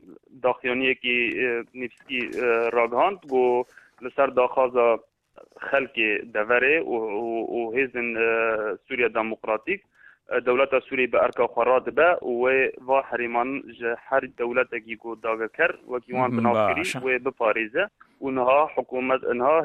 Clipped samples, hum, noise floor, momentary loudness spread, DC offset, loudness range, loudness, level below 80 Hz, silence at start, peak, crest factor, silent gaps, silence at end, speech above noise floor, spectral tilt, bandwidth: under 0.1%; none; -52 dBFS; 9 LU; under 0.1%; 3 LU; -24 LUFS; -62 dBFS; 0.1 s; -6 dBFS; 18 dB; none; 0 s; 28 dB; -5.5 dB/octave; 12 kHz